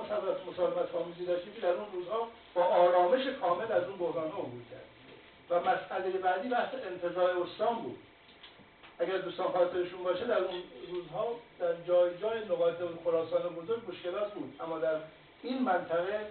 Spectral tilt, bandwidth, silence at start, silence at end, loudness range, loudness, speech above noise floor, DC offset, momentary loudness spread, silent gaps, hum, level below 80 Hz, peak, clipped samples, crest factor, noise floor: -3 dB/octave; 4.5 kHz; 0 s; 0 s; 4 LU; -33 LUFS; 24 dB; under 0.1%; 11 LU; none; none; -72 dBFS; -14 dBFS; under 0.1%; 20 dB; -56 dBFS